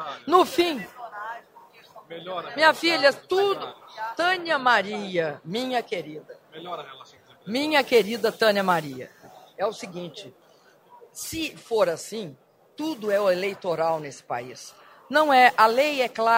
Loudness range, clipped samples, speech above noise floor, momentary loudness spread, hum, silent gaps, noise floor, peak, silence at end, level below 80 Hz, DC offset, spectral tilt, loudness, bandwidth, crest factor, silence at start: 8 LU; under 0.1%; 33 dB; 21 LU; none; none; -57 dBFS; -2 dBFS; 0 s; -68 dBFS; under 0.1%; -3.5 dB/octave; -23 LUFS; 16 kHz; 22 dB; 0 s